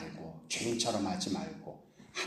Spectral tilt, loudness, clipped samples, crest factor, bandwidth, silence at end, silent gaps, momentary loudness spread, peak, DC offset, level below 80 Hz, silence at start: -3.5 dB/octave; -35 LUFS; under 0.1%; 20 dB; 14 kHz; 0 s; none; 17 LU; -18 dBFS; under 0.1%; -68 dBFS; 0 s